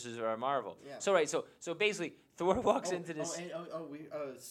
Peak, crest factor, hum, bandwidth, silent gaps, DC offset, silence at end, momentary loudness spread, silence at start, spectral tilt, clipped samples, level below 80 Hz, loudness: -14 dBFS; 22 dB; none; 16 kHz; none; under 0.1%; 0 s; 12 LU; 0 s; -3.5 dB/octave; under 0.1%; -66 dBFS; -35 LUFS